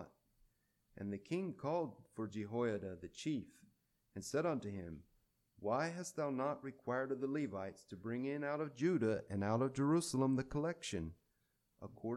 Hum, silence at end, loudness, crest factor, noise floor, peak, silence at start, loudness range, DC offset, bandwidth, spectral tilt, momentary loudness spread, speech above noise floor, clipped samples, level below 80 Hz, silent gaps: none; 0 s; -41 LUFS; 18 dB; -82 dBFS; -24 dBFS; 0 s; 5 LU; under 0.1%; 13.5 kHz; -6 dB/octave; 13 LU; 42 dB; under 0.1%; -68 dBFS; none